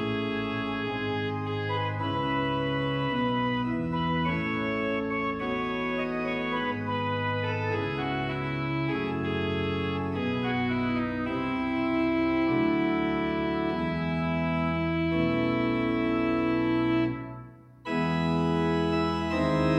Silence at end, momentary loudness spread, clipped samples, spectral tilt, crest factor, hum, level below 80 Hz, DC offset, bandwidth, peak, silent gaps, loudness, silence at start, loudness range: 0 s; 4 LU; under 0.1%; -7.5 dB/octave; 16 dB; none; -52 dBFS; under 0.1%; 8 kHz; -12 dBFS; none; -28 LUFS; 0 s; 2 LU